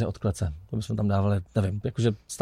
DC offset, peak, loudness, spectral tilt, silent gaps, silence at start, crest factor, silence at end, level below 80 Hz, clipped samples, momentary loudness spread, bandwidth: under 0.1%; -10 dBFS; -28 LUFS; -7 dB/octave; none; 0 s; 16 dB; 0 s; -46 dBFS; under 0.1%; 6 LU; 13.5 kHz